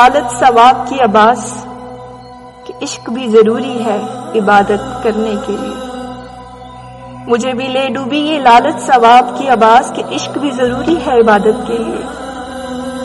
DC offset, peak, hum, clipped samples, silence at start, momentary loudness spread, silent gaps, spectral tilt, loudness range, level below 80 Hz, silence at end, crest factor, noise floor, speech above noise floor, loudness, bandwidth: under 0.1%; 0 dBFS; none; 0.3%; 0 s; 22 LU; none; -4.5 dB/octave; 6 LU; -42 dBFS; 0 s; 12 dB; -33 dBFS; 22 dB; -11 LUFS; 12 kHz